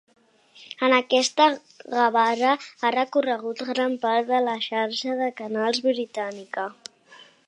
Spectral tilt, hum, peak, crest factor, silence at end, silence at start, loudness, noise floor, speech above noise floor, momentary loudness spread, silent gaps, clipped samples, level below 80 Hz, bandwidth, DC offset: -2.5 dB/octave; none; -4 dBFS; 20 dB; 0.3 s; 0.6 s; -23 LUFS; -52 dBFS; 28 dB; 12 LU; none; under 0.1%; -82 dBFS; 11 kHz; under 0.1%